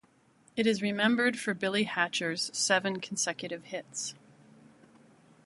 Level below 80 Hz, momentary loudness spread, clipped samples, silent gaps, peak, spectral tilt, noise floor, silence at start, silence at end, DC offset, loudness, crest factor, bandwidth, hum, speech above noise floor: -76 dBFS; 12 LU; under 0.1%; none; -10 dBFS; -3 dB/octave; -64 dBFS; 0.55 s; 1.3 s; under 0.1%; -30 LUFS; 22 dB; 11.5 kHz; none; 34 dB